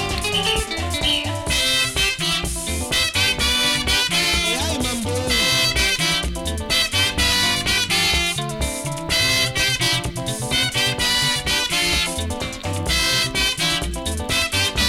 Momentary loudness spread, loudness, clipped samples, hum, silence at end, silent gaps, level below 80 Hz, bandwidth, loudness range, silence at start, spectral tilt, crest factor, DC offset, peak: 8 LU; -18 LUFS; under 0.1%; none; 0 s; none; -32 dBFS; 17 kHz; 2 LU; 0 s; -2 dB/octave; 14 dB; under 0.1%; -6 dBFS